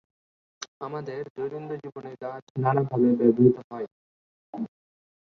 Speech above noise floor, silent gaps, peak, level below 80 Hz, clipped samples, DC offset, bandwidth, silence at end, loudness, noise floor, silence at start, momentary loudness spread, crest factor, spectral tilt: over 65 dB; 0.68-0.81 s, 1.30-1.35 s, 2.42-2.55 s, 3.64-3.70 s, 3.92-4.53 s; -6 dBFS; -66 dBFS; under 0.1%; under 0.1%; 6.6 kHz; 0.55 s; -25 LUFS; under -90 dBFS; 0.6 s; 19 LU; 22 dB; -8 dB/octave